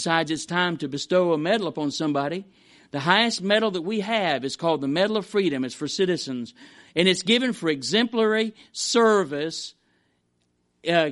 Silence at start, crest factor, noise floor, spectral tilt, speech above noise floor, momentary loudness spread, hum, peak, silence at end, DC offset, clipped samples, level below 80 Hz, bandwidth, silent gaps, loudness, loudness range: 0 s; 22 dB; -70 dBFS; -4 dB/octave; 47 dB; 10 LU; none; -2 dBFS; 0 s; under 0.1%; under 0.1%; -70 dBFS; 11.5 kHz; none; -23 LUFS; 2 LU